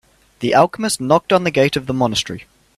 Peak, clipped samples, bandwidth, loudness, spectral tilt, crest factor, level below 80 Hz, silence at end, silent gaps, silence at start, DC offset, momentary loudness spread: 0 dBFS; under 0.1%; 15 kHz; -17 LUFS; -4.5 dB/octave; 18 dB; -50 dBFS; 0.35 s; none; 0.4 s; under 0.1%; 10 LU